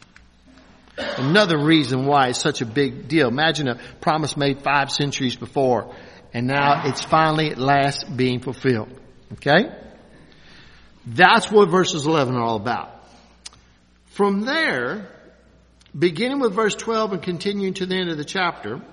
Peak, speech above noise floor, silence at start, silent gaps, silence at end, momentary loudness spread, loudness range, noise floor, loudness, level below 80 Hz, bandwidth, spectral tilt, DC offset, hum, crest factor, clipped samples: 0 dBFS; 35 dB; 0.95 s; none; 0.05 s; 11 LU; 5 LU; -54 dBFS; -20 LUFS; -54 dBFS; 11 kHz; -5 dB/octave; under 0.1%; none; 22 dB; under 0.1%